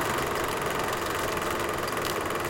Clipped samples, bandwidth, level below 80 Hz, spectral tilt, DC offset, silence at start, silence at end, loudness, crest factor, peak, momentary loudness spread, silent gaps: under 0.1%; 17 kHz; -48 dBFS; -3.5 dB/octave; under 0.1%; 0 s; 0 s; -28 LUFS; 18 dB; -10 dBFS; 1 LU; none